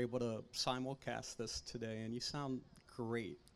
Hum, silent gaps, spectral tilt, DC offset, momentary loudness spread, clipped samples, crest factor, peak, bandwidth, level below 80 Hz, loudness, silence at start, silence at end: none; none; -4.5 dB/octave; under 0.1%; 6 LU; under 0.1%; 22 dB; -22 dBFS; 14.5 kHz; -66 dBFS; -43 LUFS; 0 s; 0.05 s